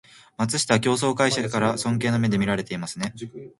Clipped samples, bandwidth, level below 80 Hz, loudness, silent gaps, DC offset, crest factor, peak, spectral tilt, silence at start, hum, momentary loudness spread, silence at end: under 0.1%; 11.5 kHz; -56 dBFS; -23 LUFS; none; under 0.1%; 22 dB; -2 dBFS; -4.5 dB/octave; 0.4 s; none; 10 LU; 0.1 s